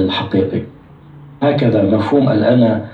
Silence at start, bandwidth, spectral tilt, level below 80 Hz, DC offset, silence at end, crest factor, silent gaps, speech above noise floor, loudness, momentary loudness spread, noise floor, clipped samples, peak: 0 s; 5.8 kHz; -9 dB/octave; -52 dBFS; under 0.1%; 0 s; 14 dB; none; 25 dB; -14 LUFS; 8 LU; -39 dBFS; under 0.1%; -2 dBFS